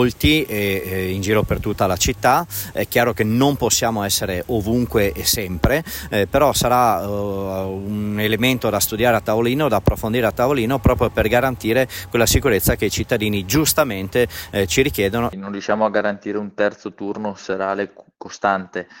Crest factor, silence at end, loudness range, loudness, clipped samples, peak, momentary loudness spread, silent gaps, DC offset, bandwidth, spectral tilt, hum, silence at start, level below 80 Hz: 16 dB; 0 s; 3 LU; -19 LUFS; under 0.1%; -4 dBFS; 9 LU; none; under 0.1%; 16.5 kHz; -4.5 dB/octave; none; 0 s; -34 dBFS